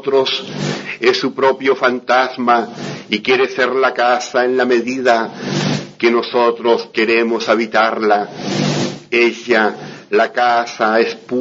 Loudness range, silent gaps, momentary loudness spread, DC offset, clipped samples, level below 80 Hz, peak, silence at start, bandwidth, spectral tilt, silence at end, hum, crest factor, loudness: 1 LU; none; 6 LU; under 0.1%; under 0.1%; -62 dBFS; 0 dBFS; 0 s; 7.8 kHz; -4.5 dB/octave; 0 s; none; 16 dB; -15 LUFS